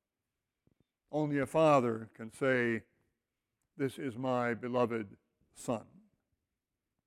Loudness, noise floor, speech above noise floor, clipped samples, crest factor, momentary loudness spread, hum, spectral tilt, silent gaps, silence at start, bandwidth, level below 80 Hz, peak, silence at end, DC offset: -33 LUFS; -89 dBFS; 57 dB; under 0.1%; 20 dB; 13 LU; none; -6.5 dB/octave; none; 1.1 s; 16 kHz; -72 dBFS; -16 dBFS; 1.25 s; under 0.1%